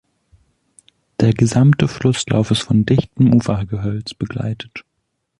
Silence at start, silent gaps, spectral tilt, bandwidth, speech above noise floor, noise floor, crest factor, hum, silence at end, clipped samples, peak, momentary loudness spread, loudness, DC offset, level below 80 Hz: 1.2 s; none; -6.5 dB/octave; 11 kHz; 56 dB; -72 dBFS; 16 dB; none; 0.6 s; under 0.1%; -2 dBFS; 13 LU; -17 LUFS; under 0.1%; -42 dBFS